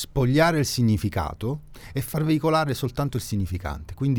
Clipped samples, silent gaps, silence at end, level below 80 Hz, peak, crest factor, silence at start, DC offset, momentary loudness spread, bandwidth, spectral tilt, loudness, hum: under 0.1%; none; 0 s; -40 dBFS; -6 dBFS; 18 dB; 0 s; under 0.1%; 12 LU; 20 kHz; -6 dB/octave; -24 LUFS; none